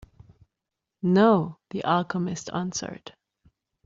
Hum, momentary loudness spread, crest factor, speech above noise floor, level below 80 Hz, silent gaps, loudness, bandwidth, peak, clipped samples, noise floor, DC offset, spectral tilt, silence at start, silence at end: none; 14 LU; 20 dB; 62 dB; -62 dBFS; none; -25 LUFS; 7.8 kHz; -8 dBFS; under 0.1%; -86 dBFS; under 0.1%; -6 dB/octave; 1.05 s; 0.75 s